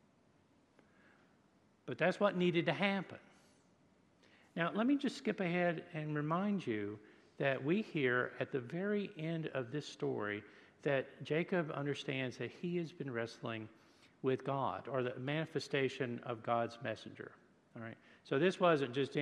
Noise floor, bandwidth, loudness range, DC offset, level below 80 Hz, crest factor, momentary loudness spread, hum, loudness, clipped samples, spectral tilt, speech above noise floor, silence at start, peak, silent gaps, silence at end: -71 dBFS; 11 kHz; 3 LU; under 0.1%; -86 dBFS; 22 dB; 14 LU; none; -38 LUFS; under 0.1%; -6.5 dB/octave; 33 dB; 1.85 s; -18 dBFS; none; 0 s